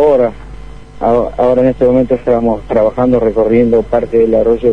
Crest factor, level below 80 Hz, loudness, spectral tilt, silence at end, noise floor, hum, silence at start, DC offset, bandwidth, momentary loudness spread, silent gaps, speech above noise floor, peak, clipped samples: 10 dB; -32 dBFS; -12 LUFS; -9 dB/octave; 0 s; -30 dBFS; none; 0 s; 2%; 6.4 kHz; 3 LU; none; 19 dB; 0 dBFS; under 0.1%